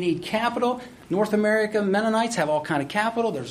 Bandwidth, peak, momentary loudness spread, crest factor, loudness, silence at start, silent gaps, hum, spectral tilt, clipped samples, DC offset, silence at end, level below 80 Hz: 15 kHz; -8 dBFS; 5 LU; 16 dB; -24 LUFS; 0 s; none; none; -5 dB/octave; under 0.1%; under 0.1%; 0 s; -60 dBFS